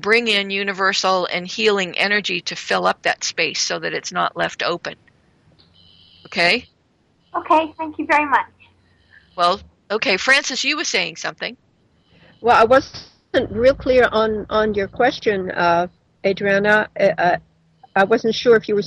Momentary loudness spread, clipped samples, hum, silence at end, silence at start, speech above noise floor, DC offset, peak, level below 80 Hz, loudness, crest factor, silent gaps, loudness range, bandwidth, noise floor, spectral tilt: 11 LU; under 0.1%; none; 0 s; 0 s; 43 dB; under 0.1%; -2 dBFS; -50 dBFS; -18 LUFS; 16 dB; none; 5 LU; 11.5 kHz; -61 dBFS; -3 dB/octave